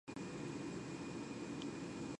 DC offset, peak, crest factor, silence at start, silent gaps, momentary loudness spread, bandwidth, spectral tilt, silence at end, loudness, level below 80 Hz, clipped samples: under 0.1%; -32 dBFS; 14 dB; 0.05 s; none; 1 LU; 11.5 kHz; -5.5 dB/octave; 0 s; -47 LUFS; -70 dBFS; under 0.1%